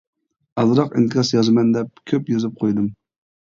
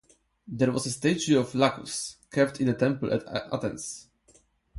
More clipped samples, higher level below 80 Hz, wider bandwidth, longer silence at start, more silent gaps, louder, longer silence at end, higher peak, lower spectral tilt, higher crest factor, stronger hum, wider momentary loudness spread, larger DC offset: neither; about the same, -60 dBFS vs -60 dBFS; second, 7.4 kHz vs 11.5 kHz; about the same, 0.55 s vs 0.45 s; neither; first, -19 LUFS vs -27 LUFS; first, 0.5 s vs 0 s; about the same, -4 dBFS vs -6 dBFS; first, -6.5 dB/octave vs -5 dB/octave; second, 16 dB vs 22 dB; neither; second, 8 LU vs 11 LU; neither